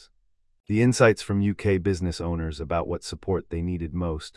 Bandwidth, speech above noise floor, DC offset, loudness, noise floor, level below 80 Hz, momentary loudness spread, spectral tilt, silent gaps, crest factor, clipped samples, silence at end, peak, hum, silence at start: 12 kHz; 41 dB; under 0.1%; -25 LUFS; -66 dBFS; -44 dBFS; 10 LU; -6.5 dB/octave; none; 20 dB; under 0.1%; 0.05 s; -4 dBFS; none; 0.7 s